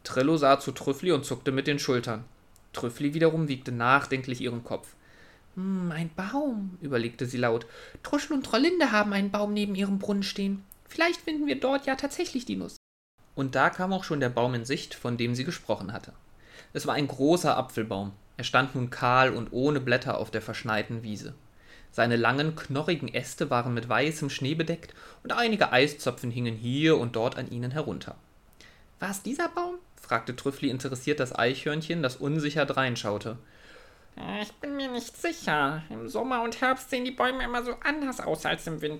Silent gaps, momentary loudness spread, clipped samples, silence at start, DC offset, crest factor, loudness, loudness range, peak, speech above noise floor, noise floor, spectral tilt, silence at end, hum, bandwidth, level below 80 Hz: 12.76-13.18 s; 12 LU; under 0.1%; 0.05 s; under 0.1%; 22 dB; -28 LUFS; 5 LU; -8 dBFS; 27 dB; -55 dBFS; -5.5 dB/octave; 0 s; none; 16.5 kHz; -56 dBFS